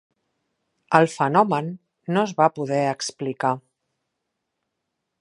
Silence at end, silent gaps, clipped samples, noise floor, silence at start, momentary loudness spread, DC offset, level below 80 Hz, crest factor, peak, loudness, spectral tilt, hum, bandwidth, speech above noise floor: 1.6 s; none; under 0.1%; -80 dBFS; 0.9 s; 10 LU; under 0.1%; -74 dBFS; 24 dB; 0 dBFS; -22 LUFS; -5.5 dB/octave; none; 11.5 kHz; 59 dB